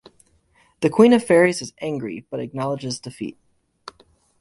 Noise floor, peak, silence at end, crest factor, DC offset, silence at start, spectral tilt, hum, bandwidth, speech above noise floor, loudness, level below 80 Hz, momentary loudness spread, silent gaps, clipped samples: -60 dBFS; -2 dBFS; 1.1 s; 20 dB; under 0.1%; 0.8 s; -5.5 dB/octave; none; 11.5 kHz; 41 dB; -20 LUFS; -60 dBFS; 17 LU; none; under 0.1%